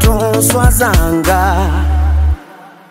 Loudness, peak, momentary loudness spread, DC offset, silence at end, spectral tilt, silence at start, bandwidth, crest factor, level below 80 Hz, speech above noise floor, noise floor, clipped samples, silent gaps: -12 LUFS; 0 dBFS; 5 LU; under 0.1%; 0.2 s; -5 dB/octave; 0 s; 16.5 kHz; 12 dB; -14 dBFS; 26 dB; -36 dBFS; under 0.1%; none